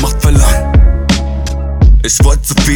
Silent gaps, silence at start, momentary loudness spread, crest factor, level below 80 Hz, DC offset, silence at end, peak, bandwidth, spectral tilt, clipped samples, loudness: none; 0 s; 7 LU; 8 dB; -10 dBFS; under 0.1%; 0 s; 0 dBFS; 18.5 kHz; -4.5 dB/octave; under 0.1%; -11 LUFS